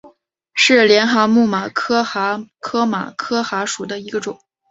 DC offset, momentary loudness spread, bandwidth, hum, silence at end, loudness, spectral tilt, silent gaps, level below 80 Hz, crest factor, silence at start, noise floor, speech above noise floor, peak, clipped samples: under 0.1%; 14 LU; 8 kHz; none; 0.35 s; -17 LUFS; -3.5 dB/octave; none; -62 dBFS; 16 dB; 0.05 s; -51 dBFS; 34 dB; -2 dBFS; under 0.1%